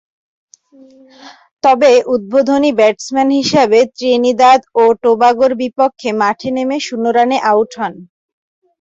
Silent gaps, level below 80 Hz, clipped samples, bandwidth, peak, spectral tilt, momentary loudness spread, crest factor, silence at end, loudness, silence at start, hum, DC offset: 1.51-1.57 s; -56 dBFS; under 0.1%; 7.8 kHz; 0 dBFS; -4 dB/octave; 8 LU; 12 dB; 0.75 s; -12 LUFS; 1.25 s; none; under 0.1%